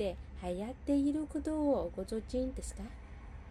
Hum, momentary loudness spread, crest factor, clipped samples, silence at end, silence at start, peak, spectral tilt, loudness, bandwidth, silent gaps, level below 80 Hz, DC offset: none; 16 LU; 16 dB; under 0.1%; 0 s; 0 s; -22 dBFS; -6.5 dB/octave; -36 LUFS; 13 kHz; none; -48 dBFS; under 0.1%